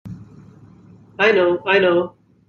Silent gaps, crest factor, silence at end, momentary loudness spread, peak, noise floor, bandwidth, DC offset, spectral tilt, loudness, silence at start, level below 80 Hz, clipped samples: none; 18 dB; 0.4 s; 20 LU; -2 dBFS; -46 dBFS; 6.8 kHz; under 0.1%; -6 dB/octave; -16 LUFS; 0.05 s; -60 dBFS; under 0.1%